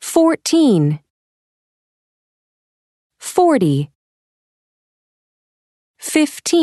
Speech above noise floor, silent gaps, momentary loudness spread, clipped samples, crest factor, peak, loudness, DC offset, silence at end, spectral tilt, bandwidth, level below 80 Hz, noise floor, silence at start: over 76 dB; 1.10-3.10 s, 3.95-5.94 s; 15 LU; under 0.1%; 18 dB; 0 dBFS; -16 LUFS; under 0.1%; 0 s; -5.5 dB/octave; 12.5 kHz; -64 dBFS; under -90 dBFS; 0 s